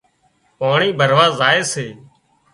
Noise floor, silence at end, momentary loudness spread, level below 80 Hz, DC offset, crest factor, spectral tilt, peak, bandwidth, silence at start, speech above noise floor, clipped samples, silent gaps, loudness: -60 dBFS; 0.55 s; 12 LU; -60 dBFS; under 0.1%; 18 dB; -3.5 dB/octave; 0 dBFS; 11.5 kHz; 0.6 s; 45 dB; under 0.1%; none; -15 LUFS